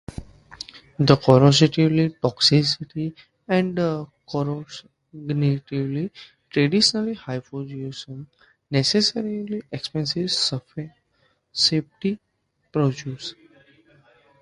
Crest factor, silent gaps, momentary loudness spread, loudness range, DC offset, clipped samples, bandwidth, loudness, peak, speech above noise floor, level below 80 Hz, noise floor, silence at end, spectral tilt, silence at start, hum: 22 dB; none; 20 LU; 7 LU; under 0.1%; under 0.1%; 11.5 kHz; -22 LUFS; 0 dBFS; 44 dB; -54 dBFS; -66 dBFS; 1.1 s; -5.5 dB/octave; 0.1 s; none